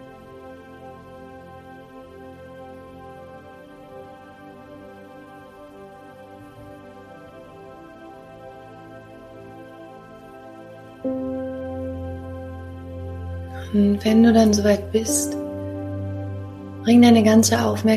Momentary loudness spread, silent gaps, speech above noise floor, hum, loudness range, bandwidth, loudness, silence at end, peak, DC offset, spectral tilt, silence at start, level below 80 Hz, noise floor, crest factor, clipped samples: 27 LU; none; 27 dB; none; 24 LU; 15 kHz; -20 LUFS; 0 s; -2 dBFS; under 0.1%; -5 dB/octave; 0 s; -50 dBFS; -43 dBFS; 20 dB; under 0.1%